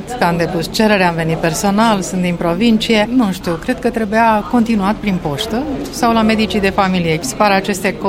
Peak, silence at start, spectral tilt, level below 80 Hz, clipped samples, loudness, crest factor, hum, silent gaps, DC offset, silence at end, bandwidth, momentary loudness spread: 0 dBFS; 0 s; -5 dB/octave; -36 dBFS; under 0.1%; -15 LUFS; 14 dB; none; none; under 0.1%; 0 s; 16.5 kHz; 6 LU